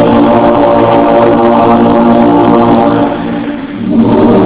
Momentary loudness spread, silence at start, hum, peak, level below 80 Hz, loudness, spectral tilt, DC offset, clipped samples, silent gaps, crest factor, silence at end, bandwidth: 8 LU; 0 s; none; 0 dBFS; -32 dBFS; -7 LUFS; -11.5 dB/octave; under 0.1%; 7%; none; 6 dB; 0 s; 4 kHz